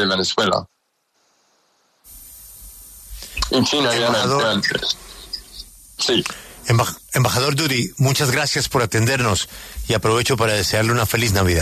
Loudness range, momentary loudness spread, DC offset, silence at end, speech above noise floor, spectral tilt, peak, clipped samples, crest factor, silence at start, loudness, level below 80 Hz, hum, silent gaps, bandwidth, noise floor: 6 LU; 20 LU; under 0.1%; 0 s; 48 dB; -4 dB/octave; -4 dBFS; under 0.1%; 16 dB; 0 s; -18 LUFS; -40 dBFS; none; none; 13.5 kHz; -67 dBFS